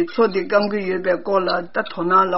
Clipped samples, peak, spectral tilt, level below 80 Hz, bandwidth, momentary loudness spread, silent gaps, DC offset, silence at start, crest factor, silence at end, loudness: under 0.1%; -4 dBFS; -3.5 dB/octave; -62 dBFS; 6 kHz; 5 LU; none; 1%; 0 s; 16 dB; 0 s; -20 LUFS